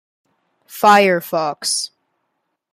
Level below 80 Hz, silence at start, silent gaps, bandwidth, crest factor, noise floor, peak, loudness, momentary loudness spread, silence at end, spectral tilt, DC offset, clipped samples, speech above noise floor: -70 dBFS; 0.7 s; none; 15.5 kHz; 18 dB; -73 dBFS; 0 dBFS; -15 LUFS; 15 LU; 0.85 s; -3 dB/octave; under 0.1%; under 0.1%; 57 dB